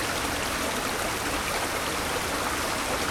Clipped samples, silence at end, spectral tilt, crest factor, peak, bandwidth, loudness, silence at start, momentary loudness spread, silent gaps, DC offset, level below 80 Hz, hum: under 0.1%; 0 s; -2.5 dB/octave; 14 dB; -14 dBFS; 19 kHz; -27 LUFS; 0 s; 0 LU; none; under 0.1%; -44 dBFS; none